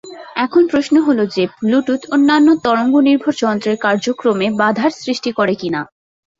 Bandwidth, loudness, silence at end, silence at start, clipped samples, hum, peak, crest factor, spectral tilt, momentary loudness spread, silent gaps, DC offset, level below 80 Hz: 7.8 kHz; -15 LUFS; 0.55 s; 0.05 s; under 0.1%; none; -2 dBFS; 14 dB; -5.5 dB/octave; 8 LU; none; under 0.1%; -58 dBFS